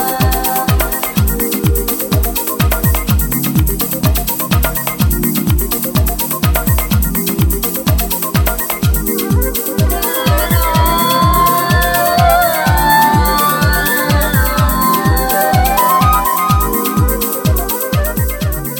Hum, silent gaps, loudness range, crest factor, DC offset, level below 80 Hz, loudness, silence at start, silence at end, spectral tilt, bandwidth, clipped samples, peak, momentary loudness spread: none; none; 3 LU; 12 dB; under 0.1%; -20 dBFS; -13 LUFS; 0 s; 0 s; -4.5 dB/octave; 18 kHz; under 0.1%; 0 dBFS; 4 LU